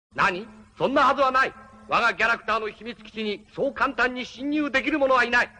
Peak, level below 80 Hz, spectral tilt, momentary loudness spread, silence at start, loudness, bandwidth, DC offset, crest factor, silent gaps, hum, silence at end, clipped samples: -10 dBFS; -54 dBFS; -4 dB/octave; 12 LU; 0.15 s; -23 LUFS; 10 kHz; under 0.1%; 16 dB; none; none; 0.1 s; under 0.1%